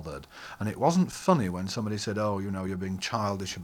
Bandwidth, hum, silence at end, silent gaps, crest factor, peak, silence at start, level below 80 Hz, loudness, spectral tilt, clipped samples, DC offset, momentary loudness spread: 16.5 kHz; none; 0 s; none; 20 dB; -8 dBFS; 0 s; -58 dBFS; -29 LUFS; -5.5 dB/octave; under 0.1%; under 0.1%; 10 LU